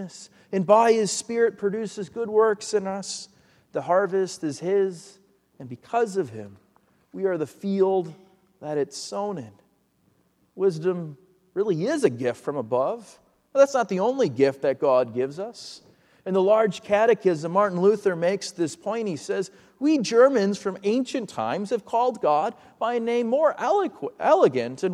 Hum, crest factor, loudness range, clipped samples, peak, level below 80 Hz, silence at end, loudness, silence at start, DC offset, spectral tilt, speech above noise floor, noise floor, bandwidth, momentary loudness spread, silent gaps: none; 20 dB; 6 LU; under 0.1%; -4 dBFS; -74 dBFS; 0 s; -24 LUFS; 0 s; under 0.1%; -5.5 dB/octave; 42 dB; -66 dBFS; 12 kHz; 14 LU; none